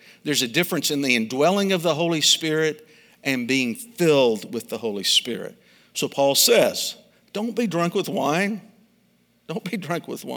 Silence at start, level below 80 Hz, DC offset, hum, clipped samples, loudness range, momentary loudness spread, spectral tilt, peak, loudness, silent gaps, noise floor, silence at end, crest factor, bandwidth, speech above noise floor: 0.25 s; -76 dBFS; under 0.1%; none; under 0.1%; 5 LU; 14 LU; -3 dB/octave; -4 dBFS; -21 LUFS; none; -62 dBFS; 0 s; 20 dB; over 20 kHz; 40 dB